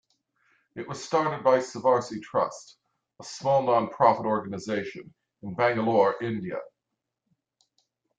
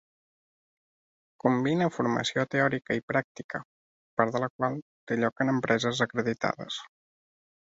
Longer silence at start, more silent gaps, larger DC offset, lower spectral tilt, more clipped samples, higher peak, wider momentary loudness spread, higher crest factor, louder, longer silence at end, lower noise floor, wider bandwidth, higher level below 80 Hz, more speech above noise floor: second, 0.75 s vs 1.45 s; second, none vs 3.03-3.08 s, 3.24-3.35 s, 3.44-3.49 s, 3.65-4.17 s, 4.50-4.59 s, 4.82-5.07 s; neither; about the same, -5.5 dB/octave vs -5.5 dB/octave; neither; about the same, -6 dBFS vs -6 dBFS; first, 18 LU vs 12 LU; about the same, 22 dB vs 24 dB; first, -26 LUFS vs -29 LUFS; first, 1.55 s vs 0.9 s; second, -84 dBFS vs under -90 dBFS; first, 9.2 kHz vs 8 kHz; about the same, -70 dBFS vs -68 dBFS; second, 58 dB vs over 62 dB